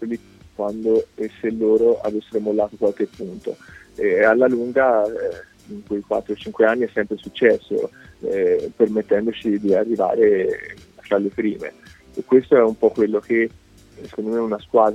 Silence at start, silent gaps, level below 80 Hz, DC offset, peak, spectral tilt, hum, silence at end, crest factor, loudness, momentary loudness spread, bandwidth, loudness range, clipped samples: 0 s; none; -56 dBFS; under 0.1%; -2 dBFS; -7 dB/octave; none; 0 s; 18 dB; -20 LUFS; 15 LU; 8.4 kHz; 2 LU; under 0.1%